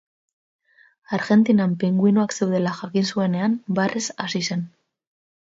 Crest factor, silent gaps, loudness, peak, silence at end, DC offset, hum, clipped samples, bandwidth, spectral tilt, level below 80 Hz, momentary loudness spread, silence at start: 16 dB; none; -21 LUFS; -6 dBFS; 0.75 s; under 0.1%; none; under 0.1%; 7.8 kHz; -5.5 dB/octave; -66 dBFS; 9 LU; 1.1 s